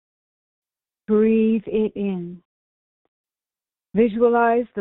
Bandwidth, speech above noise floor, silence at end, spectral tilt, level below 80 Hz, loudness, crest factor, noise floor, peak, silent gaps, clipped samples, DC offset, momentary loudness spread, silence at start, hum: 4 kHz; over 71 dB; 0 s; -7 dB/octave; -58 dBFS; -20 LUFS; 18 dB; under -90 dBFS; -6 dBFS; 2.45-3.24 s; under 0.1%; under 0.1%; 10 LU; 1.1 s; none